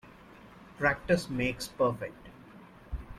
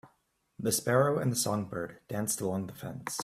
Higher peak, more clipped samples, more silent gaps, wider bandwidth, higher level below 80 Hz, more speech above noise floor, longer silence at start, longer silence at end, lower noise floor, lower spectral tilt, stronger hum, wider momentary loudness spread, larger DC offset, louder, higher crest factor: about the same, -12 dBFS vs -12 dBFS; neither; neither; about the same, 15 kHz vs 16 kHz; first, -48 dBFS vs -66 dBFS; second, 23 dB vs 42 dB; about the same, 0.05 s vs 0.05 s; about the same, 0 s vs 0 s; second, -53 dBFS vs -73 dBFS; about the same, -5.5 dB/octave vs -4.5 dB/octave; neither; first, 24 LU vs 12 LU; neither; about the same, -31 LUFS vs -31 LUFS; about the same, 22 dB vs 20 dB